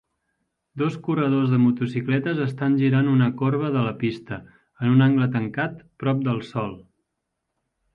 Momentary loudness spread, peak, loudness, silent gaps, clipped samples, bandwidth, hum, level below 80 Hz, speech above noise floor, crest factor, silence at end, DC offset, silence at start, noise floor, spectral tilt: 11 LU; -6 dBFS; -22 LUFS; none; under 0.1%; 5.4 kHz; none; -62 dBFS; 58 dB; 16 dB; 1.15 s; under 0.1%; 0.75 s; -79 dBFS; -9.5 dB/octave